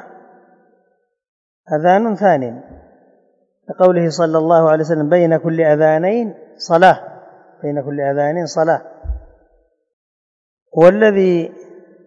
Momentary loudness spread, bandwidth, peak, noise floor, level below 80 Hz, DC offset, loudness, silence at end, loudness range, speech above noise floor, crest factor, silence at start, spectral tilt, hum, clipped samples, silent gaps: 17 LU; 8 kHz; 0 dBFS; -63 dBFS; -40 dBFS; under 0.1%; -14 LUFS; 0.45 s; 7 LU; 50 dB; 16 dB; 1.7 s; -7 dB/octave; none; 0.2%; 9.93-10.66 s